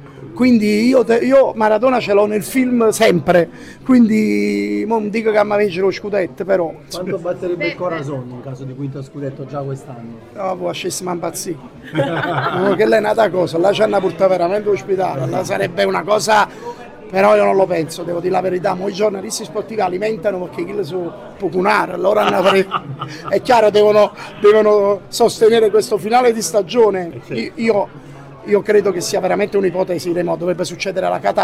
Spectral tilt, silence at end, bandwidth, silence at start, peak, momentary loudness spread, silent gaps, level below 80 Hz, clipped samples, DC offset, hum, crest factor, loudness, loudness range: -5 dB/octave; 0 s; 16 kHz; 0 s; -2 dBFS; 14 LU; none; -54 dBFS; under 0.1%; under 0.1%; none; 14 dB; -16 LUFS; 9 LU